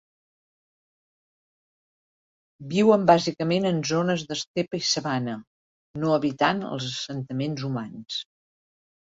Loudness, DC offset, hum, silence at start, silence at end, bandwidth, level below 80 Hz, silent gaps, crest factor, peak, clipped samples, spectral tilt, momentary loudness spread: -25 LUFS; under 0.1%; none; 2.6 s; 0.8 s; 7.8 kHz; -66 dBFS; 4.47-4.54 s, 5.47-5.94 s; 24 dB; -4 dBFS; under 0.1%; -5 dB/octave; 13 LU